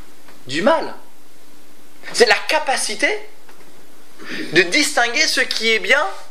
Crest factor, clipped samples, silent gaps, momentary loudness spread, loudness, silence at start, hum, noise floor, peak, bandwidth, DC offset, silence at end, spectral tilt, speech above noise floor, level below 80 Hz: 20 dB; under 0.1%; none; 15 LU; -16 LUFS; 0.45 s; none; -49 dBFS; 0 dBFS; 16 kHz; 5%; 0.05 s; -1.5 dB/octave; 31 dB; -68 dBFS